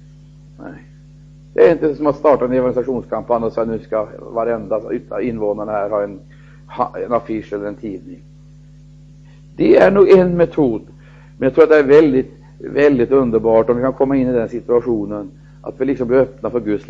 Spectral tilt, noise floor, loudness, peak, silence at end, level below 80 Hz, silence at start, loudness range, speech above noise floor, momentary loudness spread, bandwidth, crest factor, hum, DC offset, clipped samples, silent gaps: -8.5 dB/octave; -41 dBFS; -16 LUFS; 0 dBFS; 0.05 s; -44 dBFS; 0.6 s; 10 LU; 26 dB; 17 LU; 7.4 kHz; 16 dB; 50 Hz at -40 dBFS; under 0.1%; under 0.1%; none